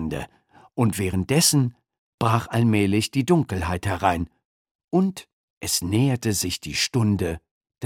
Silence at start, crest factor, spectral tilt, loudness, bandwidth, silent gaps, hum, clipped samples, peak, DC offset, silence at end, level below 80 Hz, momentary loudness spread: 0 s; 20 dB; -4.5 dB/octave; -23 LUFS; 18.5 kHz; 1.98-2.18 s, 4.45-4.65 s, 4.71-4.88 s, 5.33-5.61 s, 7.51-7.61 s; none; under 0.1%; -4 dBFS; under 0.1%; 0 s; -46 dBFS; 13 LU